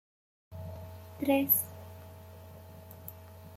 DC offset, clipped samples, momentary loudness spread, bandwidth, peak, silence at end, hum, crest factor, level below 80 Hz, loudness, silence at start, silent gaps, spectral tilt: under 0.1%; under 0.1%; 24 LU; 16.5 kHz; -14 dBFS; 0 s; none; 22 dB; -68 dBFS; -28 LUFS; 0.5 s; none; -5 dB/octave